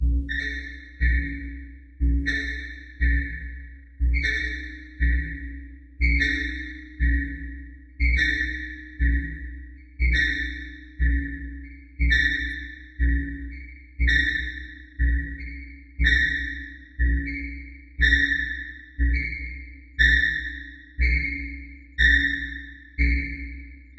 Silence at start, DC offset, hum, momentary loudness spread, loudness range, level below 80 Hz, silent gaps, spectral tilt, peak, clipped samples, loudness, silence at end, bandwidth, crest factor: 0 s; under 0.1%; none; 20 LU; 4 LU; -28 dBFS; none; -5.5 dB/octave; -6 dBFS; under 0.1%; -24 LUFS; 0.05 s; 7.6 kHz; 20 dB